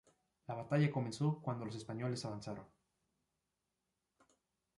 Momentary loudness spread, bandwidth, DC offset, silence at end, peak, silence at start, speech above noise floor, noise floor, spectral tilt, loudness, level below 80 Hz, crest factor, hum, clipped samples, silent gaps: 14 LU; 11.5 kHz; under 0.1%; 2.1 s; -22 dBFS; 0.5 s; 49 dB; -88 dBFS; -7 dB/octave; -40 LUFS; -76 dBFS; 20 dB; none; under 0.1%; none